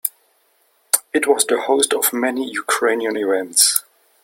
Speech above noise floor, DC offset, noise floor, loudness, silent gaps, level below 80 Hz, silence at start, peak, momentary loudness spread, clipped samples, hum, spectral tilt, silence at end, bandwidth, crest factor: 43 dB; under 0.1%; -61 dBFS; -17 LUFS; none; -68 dBFS; 0.05 s; 0 dBFS; 8 LU; under 0.1%; none; 0 dB/octave; 0.45 s; 17 kHz; 20 dB